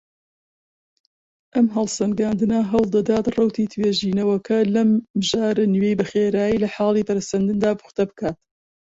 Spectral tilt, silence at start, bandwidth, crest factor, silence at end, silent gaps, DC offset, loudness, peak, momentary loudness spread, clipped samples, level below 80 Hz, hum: -6 dB/octave; 1.55 s; 8 kHz; 14 dB; 0.45 s; 5.10-5.14 s; under 0.1%; -20 LUFS; -6 dBFS; 5 LU; under 0.1%; -54 dBFS; none